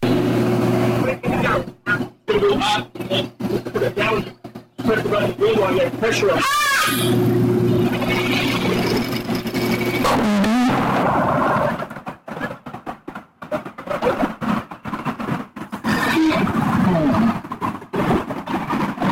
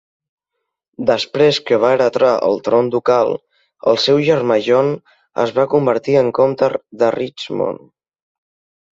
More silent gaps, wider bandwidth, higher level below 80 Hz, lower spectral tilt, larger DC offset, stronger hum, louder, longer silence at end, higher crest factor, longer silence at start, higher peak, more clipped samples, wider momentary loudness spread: neither; first, 16.5 kHz vs 7.8 kHz; first, -44 dBFS vs -60 dBFS; about the same, -5.5 dB/octave vs -5.5 dB/octave; neither; neither; second, -20 LUFS vs -16 LUFS; second, 0 s vs 1.15 s; about the same, 12 dB vs 14 dB; second, 0 s vs 1 s; second, -6 dBFS vs -2 dBFS; neither; first, 12 LU vs 8 LU